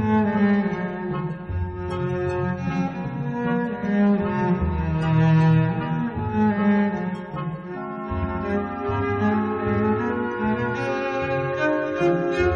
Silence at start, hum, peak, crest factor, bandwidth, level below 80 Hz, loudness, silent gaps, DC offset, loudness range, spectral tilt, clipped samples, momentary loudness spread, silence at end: 0 s; none; -10 dBFS; 14 dB; 6.8 kHz; -40 dBFS; -23 LUFS; none; under 0.1%; 4 LU; -9 dB/octave; under 0.1%; 9 LU; 0 s